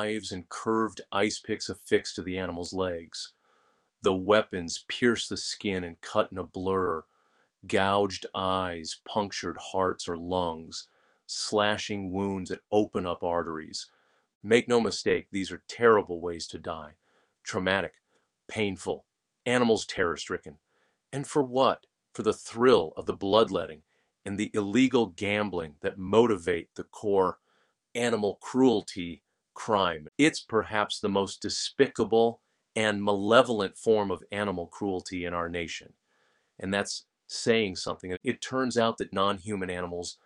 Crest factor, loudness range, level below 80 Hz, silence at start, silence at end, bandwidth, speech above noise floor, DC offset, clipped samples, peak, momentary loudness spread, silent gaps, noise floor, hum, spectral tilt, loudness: 22 dB; 5 LU; -62 dBFS; 0 s; 0.1 s; 11 kHz; 43 dB; under 0.1%; under 0.1%; -6 dBFS; 13 LU; 14.35-14.41 s; -71 dBFS; none; -4.5 dB/octave; -29 LUFS